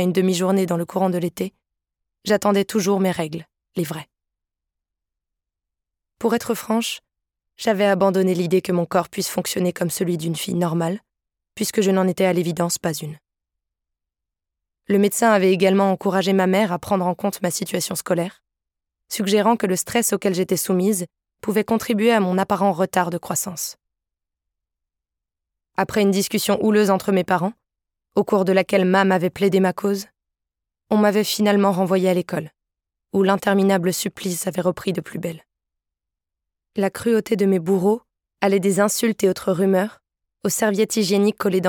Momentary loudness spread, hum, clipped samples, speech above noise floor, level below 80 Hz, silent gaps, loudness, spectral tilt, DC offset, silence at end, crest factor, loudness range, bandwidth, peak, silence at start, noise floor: 10 LU; none; under 0.1%; 65 dB; -62 dBFS; none; -20 LUFS; -5 dB/octave; under 0.1%; 0 s; 20 dB; 6 LU; 19 kHz; -2 dBFS; 0 s; -84 dBFS